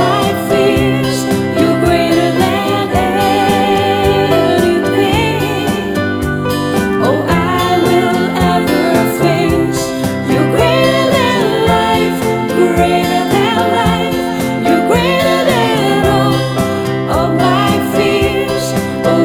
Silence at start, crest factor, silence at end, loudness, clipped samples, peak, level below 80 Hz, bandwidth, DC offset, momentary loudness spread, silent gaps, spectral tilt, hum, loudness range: 0 s; 12 dB; 0 s; -12 LUFS; under 0.1%; 0 dBFS; -34 dBFS; 20 kHz; under 0.1%; 4 LU; none; -5.5 dB/octave; none; 1 LU